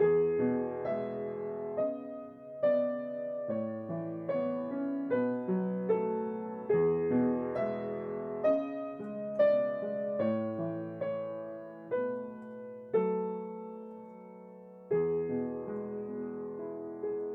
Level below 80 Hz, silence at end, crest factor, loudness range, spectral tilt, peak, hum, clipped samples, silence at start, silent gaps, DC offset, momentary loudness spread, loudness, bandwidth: -72 dBFS; 0 s; 16 dB; 5 LU; -10.5 dB/octave; -16 dBFS; none; under 0.1%; 0 s; none; under 0.1%; 15 LU; -34 LUFS; 4.5 kHz